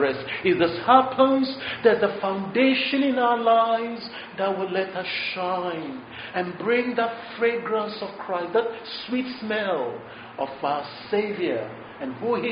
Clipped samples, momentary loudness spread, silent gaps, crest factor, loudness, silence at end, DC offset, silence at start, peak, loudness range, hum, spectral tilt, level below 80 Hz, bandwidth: under 0.1%; 13 LU; none; 22 dB; -24 LUFS; 0 s; under 0.1%; 0 s; -2 dBFS; 7 LU; none; -2.5 dB/octave; -66 dBFS; 5.2 kHz